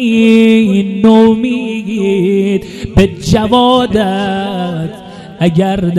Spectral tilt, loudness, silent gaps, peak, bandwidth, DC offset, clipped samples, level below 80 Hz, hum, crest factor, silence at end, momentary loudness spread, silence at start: -6.5 dB/octave; -11 LUFS; none; 0 dBFS; 12.5 kHz; under 0.1%; 1%; -32 dBFS; none; 10 dB; 0 s; 10 LU; 0 s